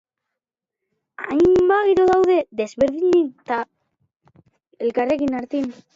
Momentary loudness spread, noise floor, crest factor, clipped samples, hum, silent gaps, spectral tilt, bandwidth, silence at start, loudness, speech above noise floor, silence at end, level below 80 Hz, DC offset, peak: 11 LU; -86 dBFS; 14 dB; under 0.1%; none; 4.16-4.20 s; -6.5 dB/octave; 7.6 kHz; 1.2 s; -19 LUFS; 67 dB; 0.25 s; -52 dBFS; under 0.1%; -6 dBFS